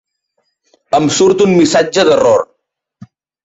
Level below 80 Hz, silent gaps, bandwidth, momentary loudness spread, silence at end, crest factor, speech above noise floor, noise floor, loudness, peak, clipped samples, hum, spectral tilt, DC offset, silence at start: -52 dBFS; none; 8.2 kHz; 6 LU; 1 s; 12 dB; 57 dB; -66 dBFS; -11 LUFS; -2 dBFS; under 0.1%; none; -4.5 dB/octave; under 0.1%; 0.9 s